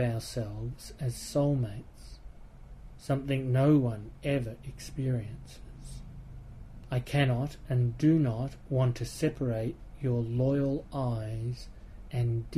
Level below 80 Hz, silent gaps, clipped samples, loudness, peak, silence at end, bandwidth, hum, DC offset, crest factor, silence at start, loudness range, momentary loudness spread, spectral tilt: -48 dBFS; none; under 0.1%; -31 LUFS; -14 dBFS; 0 s; 13 kHz; none; under 0.1%; 16 dB; 0 s; 5 LU; 22 LU; -7.5 dB/octave